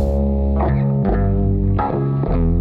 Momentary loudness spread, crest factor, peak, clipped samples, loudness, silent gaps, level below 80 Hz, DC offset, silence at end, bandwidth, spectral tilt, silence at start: 2 LU; 10 dB; -6 dBFS; under 0.1%; -18 LUFS; none; -20 dBFS; under 0.1%; 0 s; 4.6 kHz; -11.5 dB/octave; 0 s